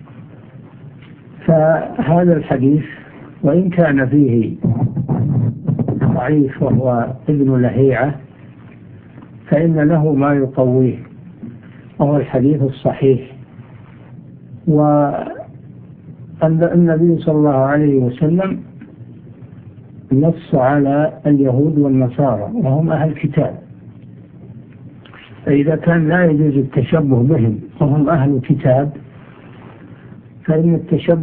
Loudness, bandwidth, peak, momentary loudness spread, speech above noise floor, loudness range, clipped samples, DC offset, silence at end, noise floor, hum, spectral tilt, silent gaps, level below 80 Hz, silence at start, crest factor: -15 LUFS; 3.8 kHz; 0 dBFS; 9 LU; 25 dB; 4 LU; under 0.1%; under 0.1%; 0 s; -38 dBFS; none; -13 dB/octave; none; -46 dBFS; 0 s; 16 dB